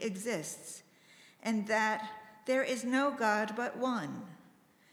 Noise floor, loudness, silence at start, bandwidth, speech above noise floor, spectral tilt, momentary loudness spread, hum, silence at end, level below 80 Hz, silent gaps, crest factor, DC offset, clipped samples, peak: -64 dBFS; -34 LUFS; 0 s; over 20 kHz; 30 dB; -4 dB/octave; 16 LU; none; 0.55 s; -84 dBFS; none; 20 dB; under 0.1%; under 0.1%; -14 dBFS